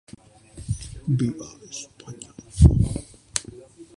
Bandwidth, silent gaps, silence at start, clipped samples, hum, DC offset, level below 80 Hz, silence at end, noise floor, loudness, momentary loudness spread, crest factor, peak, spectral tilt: 11.5 kHz; none; 0.55 s; under 0.1%; none; under 0.1%; -30 dBFS; 0.15 s; -47 dBFS; -23 LUFS; 23 LU; 22 dB; -2 dBFS; -6 dB/octave